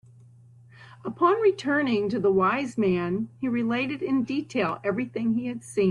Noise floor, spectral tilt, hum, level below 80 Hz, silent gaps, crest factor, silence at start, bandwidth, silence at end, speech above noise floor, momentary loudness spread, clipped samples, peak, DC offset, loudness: -52 dBFS; -6.5 dB/octave; none; -64 dBFS; none; 18 dB; 0.8 s; 11 kHz; 0 s; 27 dB; 7 LU; under 0.1%; -8 dBFS; under 0.1%; -25 LUFS